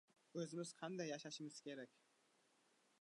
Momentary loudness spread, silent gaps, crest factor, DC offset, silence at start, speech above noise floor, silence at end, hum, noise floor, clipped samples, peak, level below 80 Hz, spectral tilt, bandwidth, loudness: 7 LU; none; 18 dB; under 0.1%; 0.35 s; 29 dB; 1.15 s; none; -79 dBFS; under 0.1%; -34 dBFS; under -90 dBFS; -4.5 dB/octave; 11 kHz; -51 LUFS